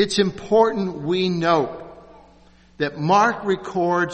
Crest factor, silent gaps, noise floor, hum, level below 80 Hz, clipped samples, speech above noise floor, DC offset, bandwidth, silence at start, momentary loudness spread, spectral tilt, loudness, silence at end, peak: 18 dB; none; -51 dBFS; none; -54 dBFS; under 0.1%; 31 dB; under 0.1%; 8.4 kHz; 0 s; 10 LU; -5.5 dB/octave; -20 LUFS; 0 s; -4 dBFS